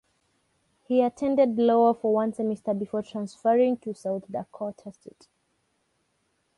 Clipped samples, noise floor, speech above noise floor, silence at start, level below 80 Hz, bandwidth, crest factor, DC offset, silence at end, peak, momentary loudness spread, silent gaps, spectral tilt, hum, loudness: under 0.1%; -73 dBFS; 48 dB; 0.9 s; -70 dBFS; 11.5 kHz; 18 dB; under 0.1%; 1.65 s; -10 dBFS; 15 LU; none; -7.5 dB/octave; none; -25 LUFS